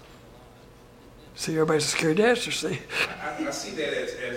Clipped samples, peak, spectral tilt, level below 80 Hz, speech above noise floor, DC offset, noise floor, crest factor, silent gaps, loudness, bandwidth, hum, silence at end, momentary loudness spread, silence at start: under 0.1%; -4 dBFS; -3.5 dB/octave; -56 dBFS; 24 dB; under 0.1%; -50 dBFS; 24 dB; none; -26 LUFS; 16.5 kHz; none; 0 s; 9 LU; 0 s